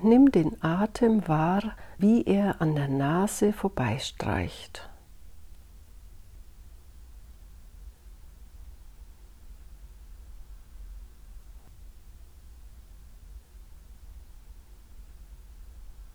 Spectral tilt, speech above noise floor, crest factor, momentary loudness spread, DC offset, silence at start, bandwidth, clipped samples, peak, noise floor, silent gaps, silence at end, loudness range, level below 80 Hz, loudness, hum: -6.5 dB/octave; 25 dB; 20 dB; 27 LU; under 0.1%; 0 s; 19 kHz; under 0.1%; -8 dBFS; -49 dBFS; none; 0.1 s; 27 LU; -48 dBFS; -25 LUFS; none